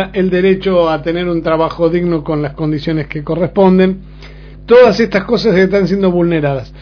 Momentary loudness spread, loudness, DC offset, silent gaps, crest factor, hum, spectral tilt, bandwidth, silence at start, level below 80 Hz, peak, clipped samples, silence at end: 9 LU; -12 LUFS; under 0.1%; none; 12 dB; none; -8 dB/octave; 5.4 kHz; 0 s; -36 dBFS; 0 dBFS; 0.3%; 0 s